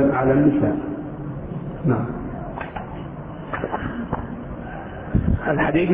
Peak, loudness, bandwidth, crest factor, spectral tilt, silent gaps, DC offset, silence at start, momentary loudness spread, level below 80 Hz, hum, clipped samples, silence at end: -6 dBFS; -24 LUFS; 3.8 kHz; 18 dB; -12 dB/octave; none; under 0.1%; 0 s; 16 LU; -34 dBFS; none; under 0.1%; 0 s